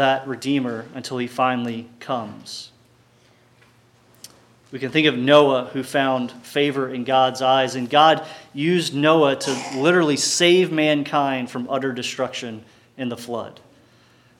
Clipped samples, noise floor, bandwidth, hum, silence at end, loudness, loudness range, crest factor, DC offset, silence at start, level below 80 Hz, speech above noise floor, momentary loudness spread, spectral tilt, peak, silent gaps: under 0.1%; -56 dBFS; 16.5 kHz; none; 0.9 s; -20 LUFS; 10 LU; 20 dB; under 0.1%; 0 s; -72 dBFS; 36 dB; 16 LU; -4 dB/octave; -2 dBFS; none